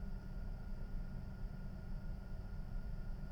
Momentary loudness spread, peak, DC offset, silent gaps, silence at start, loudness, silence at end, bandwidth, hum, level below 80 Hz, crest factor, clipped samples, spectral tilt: 1 LU; -32 dBFS; under 0.1%; none; 0 s; -50 LUFS; 0 s; 6 kHz; none; -46 dBFS; 10 dB; under 0.1%; -8 dB/octave